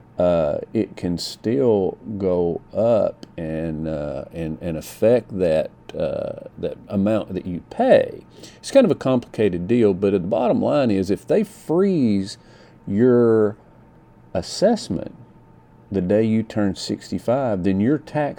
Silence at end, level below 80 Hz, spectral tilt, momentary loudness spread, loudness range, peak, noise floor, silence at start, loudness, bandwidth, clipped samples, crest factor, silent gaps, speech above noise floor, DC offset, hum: 0.05 s; -50 dBFS; -7 dB/octave; 12 LU; 4 LU; -2 dBFS; -49 dBFS; 0.15 s; -21 LUFS; 19 kHz; under 0.1%; 18 dB; none; 29 dB; under 0.1%; none